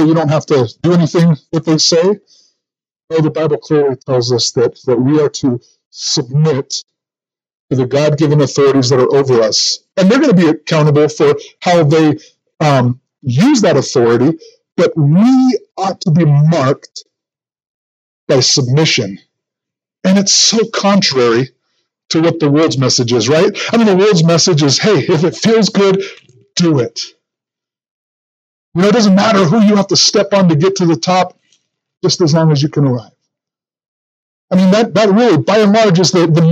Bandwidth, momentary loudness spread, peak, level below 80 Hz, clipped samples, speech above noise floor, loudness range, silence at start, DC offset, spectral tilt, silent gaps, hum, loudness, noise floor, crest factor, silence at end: 9 kHz; 9 LU; 0 dBFS; -58 dBFS; under 0.1%; over 79 dB; 5 LU; 0 s; under 0.1%; -5 dB/octave; 3.04-3.08 s, 5.86-5.91 s, 7.60-7.68 s, 17.67-18.27 s, 27.91-28.72 s, 33.88-34.48 s; none; -11 LUFS; under -90 dBFS; 12 dB; 0 s